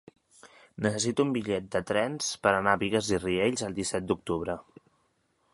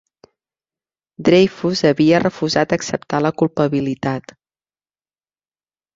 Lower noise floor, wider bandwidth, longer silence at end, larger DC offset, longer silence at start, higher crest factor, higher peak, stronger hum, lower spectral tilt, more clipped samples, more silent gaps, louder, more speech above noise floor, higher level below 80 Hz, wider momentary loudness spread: second, -72 dBFS vs under -90 dBFS; first, 11.5 kHz vs 7.8 kHz; second, 0.95 s vs 1.75 s; neither; second, 0.45 s vs 1.2 s; about the same, 22 dB vs 18 dB; second, -6 dBFS vs -2 dBFS; neither; second, -4 dB/octave vs -6 dB/octave; neither; neither; second, -29 LUFS vs -17 LUFS; second, 43 dB vs over 74 dB; about the same, -56 dBFS vs -54 dBFS; about the same, 7 LU vs 8 LU